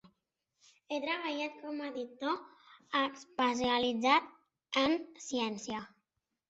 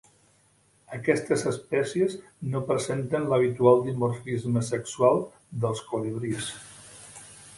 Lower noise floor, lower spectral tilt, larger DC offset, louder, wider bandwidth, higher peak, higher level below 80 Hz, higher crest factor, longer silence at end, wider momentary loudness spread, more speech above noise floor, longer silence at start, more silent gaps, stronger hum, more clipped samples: first, -85 dBFS vs -63 dBFS; second, -3 dB/octave vs -6 dB/octave; neither; second, -34 LUFS vs -26 LUFS; second, 8.2 kHz vs 11.5 kHz; second, -16 dBFS vs -6 dBFS; second, -72 dBFS vs -62 dBFS; about the same, 18 dB vs 20 dB; first, 0.6 s vs 0 s; second, 12 LU vs 20 LU; first, 51 dB vs 37 dB; second, 0.05 s vs 0.9 s; neither; neither; neither